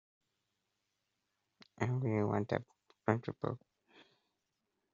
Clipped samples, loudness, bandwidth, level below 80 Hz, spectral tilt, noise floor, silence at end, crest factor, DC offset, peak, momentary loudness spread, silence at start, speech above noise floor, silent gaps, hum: under 0.1%; -37 LUFS; 7.4 kHz; -74 dBFS; -7.5 dB/octave; -86 dBFS; 1.35 s; 28 dB; under 0.1%; -14 dBFS; 8 LU; 1.8 s; 50 dB; none; none